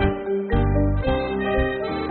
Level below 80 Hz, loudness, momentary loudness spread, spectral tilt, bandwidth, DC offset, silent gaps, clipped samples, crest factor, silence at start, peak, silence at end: -28 dBFS; -23 LUFS; 4 LU; -6 dB/octave; 4.4 kHz; under 0.1%; none; under 0.1%; 14 dB; 0 s; -6 dBFS; 0 s